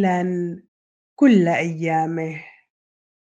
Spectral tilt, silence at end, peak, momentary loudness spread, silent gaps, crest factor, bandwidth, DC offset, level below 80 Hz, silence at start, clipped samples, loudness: -7.5 dB/octave; 0.9 s; -4 dBFS; 15 LU; 0.68-1.16 s; 18 dB; 8 kHz; under 0.1%; -70 dBFS; 0 s; under 0.1%; -20 LUFS